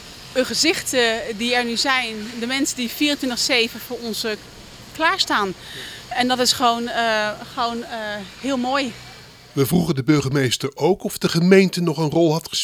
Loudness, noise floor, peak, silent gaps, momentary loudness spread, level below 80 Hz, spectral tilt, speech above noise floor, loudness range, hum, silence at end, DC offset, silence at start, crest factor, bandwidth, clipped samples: -20 LUFS; -42 dBFS; -2 dBFS; none; 11 LU; -52 dBFS; -4 dB/octave; 22 dB; 3 LU; none; 0 s; under 0.1%; 0 s; 20 dB; 18.5 kHz; under 0.1%